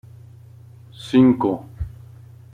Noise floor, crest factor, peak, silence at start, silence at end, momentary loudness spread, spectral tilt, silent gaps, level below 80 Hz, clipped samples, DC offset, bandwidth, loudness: -44 dBFS; 18 dB; -4 dBFS; 1 s; 0.65 s; 19 LU; -8 dB/octave; none; -44 dBFS; under 0.1%; under 0.1%; 9.8 kHz; -18 LUFS